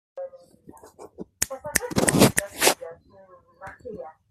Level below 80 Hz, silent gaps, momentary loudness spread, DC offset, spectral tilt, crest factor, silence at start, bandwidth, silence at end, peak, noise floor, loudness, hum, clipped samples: -52 dBFS; none; 24 LU; under 0.1%; -3.5 dB/octave; 26 dB; 0.15 s; 15.5 kHz; 0.2 s; 0 dBFS; -53 dBFS; -22 LUFS; none; under 0.1%